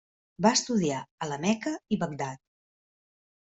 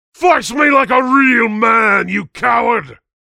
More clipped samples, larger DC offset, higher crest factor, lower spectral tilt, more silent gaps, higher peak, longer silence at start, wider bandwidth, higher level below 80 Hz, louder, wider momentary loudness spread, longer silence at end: neither; neither; first, 22 dB vs 14 dB; about the same, -4 dB/octave vs -4.5 dB/octave; first, 1.11-1.18 s vs none; second, -8 dBFS vs 0 dBFS; first, 0.4 s vs 0.2 s; second, 8.2 kHz vs 14.5 kHz; second, -68 dBFS vs -52 dBFS; second, -29 LUFS vs -12 LUFS; first, 12 LU vs 7 LU; first, 1.15 s vs 0.3 s